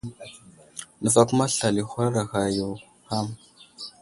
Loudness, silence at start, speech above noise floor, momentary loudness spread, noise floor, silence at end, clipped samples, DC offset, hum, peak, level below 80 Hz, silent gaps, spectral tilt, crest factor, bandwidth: -24 LUFS; 0.05 s; 20 dB; 21 LU; -44 dBFS; 0.1 s; under 0.1%; under 0.1%; none; -2 dBFS; -56 dBFS; none; -4.5 dB/octave; 24 dB; 11.5 kHz